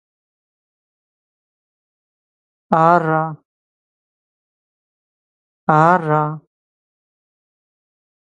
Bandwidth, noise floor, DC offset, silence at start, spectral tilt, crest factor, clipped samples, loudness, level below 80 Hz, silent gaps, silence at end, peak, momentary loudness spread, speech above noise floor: 8.2 kHz; under -90 dBFS; under 0.1%; 2.7 s; -8.5 dB/octave; 22 dB; under 0.1%; -16 LUFS; -66 dBFS; 3.45-5.67 s; 1.9 s; 0 dBFS; 12 LU; over 75 dB